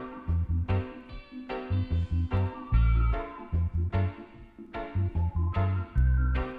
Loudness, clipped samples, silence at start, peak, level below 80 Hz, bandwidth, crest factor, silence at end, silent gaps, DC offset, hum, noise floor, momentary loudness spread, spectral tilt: -30 LUFS; under 0.1%; 0 s; -12 dBFS; -32 dBFS; 4.8 kHz; 16 dB; 0 s; none; under 0.1%; none; -48 dBFS; 15 LU; -10 dB/octave